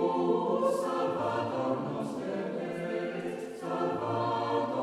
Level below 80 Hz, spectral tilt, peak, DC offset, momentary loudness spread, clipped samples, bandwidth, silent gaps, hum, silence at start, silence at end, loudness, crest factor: -72 dBFS; -6.5 dB/octave; -16 dBFS; under 0.1%; 7 LU; under 0.1%; 13.5 kHz; none; none; 0 s; 0 s; -32 LUFS; 16 dB